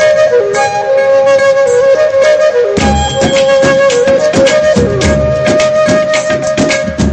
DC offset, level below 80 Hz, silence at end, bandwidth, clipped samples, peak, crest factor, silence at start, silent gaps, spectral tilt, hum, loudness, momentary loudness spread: under 0.1%; -26 dBFS; 0 s; 9.6 kHz; under 0.1%; 0 dBFS; 8 dB; 0 s; none; -4.5 dB/octave; none; -9 LUFS; 4 LU